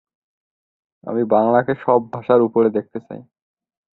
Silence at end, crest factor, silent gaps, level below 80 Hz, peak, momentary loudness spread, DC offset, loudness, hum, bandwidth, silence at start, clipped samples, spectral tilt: 0.75 s; 18 dB; none; -62 dBFS; -2 dBFS; 20 LU; under 0.1%; -18 LUFS; none; 4.2 kHz; 1.05 s; under 0.1%; -10.5 dB/octave